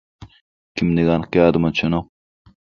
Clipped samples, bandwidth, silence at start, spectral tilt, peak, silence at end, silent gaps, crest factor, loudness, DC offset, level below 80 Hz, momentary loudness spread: under 0.1%; 7 kHz; 0.2 s; -7.5 dB/octave; 0 dBFS; 0.75 s; 0.41-0.75 s; 20 dB; -18 LUFS; under 0.1%; -42 dBFS; 9 LU